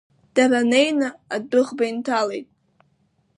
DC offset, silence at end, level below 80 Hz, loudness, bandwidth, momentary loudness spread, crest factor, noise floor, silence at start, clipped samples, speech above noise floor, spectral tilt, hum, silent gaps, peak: under 0.1%; 0.95 s; -74 dBFS; -21 LUFS; 11 kHz; 10 LU; 18 dB; -65 dBFS; 0.35 s; under 0.1%; 45 dB; -3.5 dB/octave; none; none; -4 dBFS